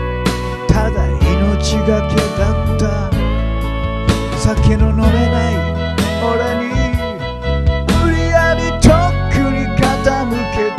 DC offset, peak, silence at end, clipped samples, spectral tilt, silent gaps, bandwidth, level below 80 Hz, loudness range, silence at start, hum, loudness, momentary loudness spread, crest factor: under 0.1%; 0 dBFS; 0 s; under 0.1%; -6 dB/octave; none; 13.5 kHz; -20 dBFS; 2 LU; 0 s; none; -15 LUFS; 5 LU; 14 dB